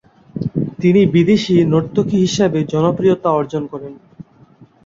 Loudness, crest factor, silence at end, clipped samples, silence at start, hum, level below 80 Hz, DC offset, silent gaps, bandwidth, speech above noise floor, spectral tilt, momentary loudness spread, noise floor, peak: -15 LUFS; 14 dB; 0.2 s; under 0.1%; 0.35 s; none; -48 dBFS; under 0.1%; none; 7.6 kHz; 32 dB; -7 dB/octave; 14 LU; -47 dBFS; -2 dBFS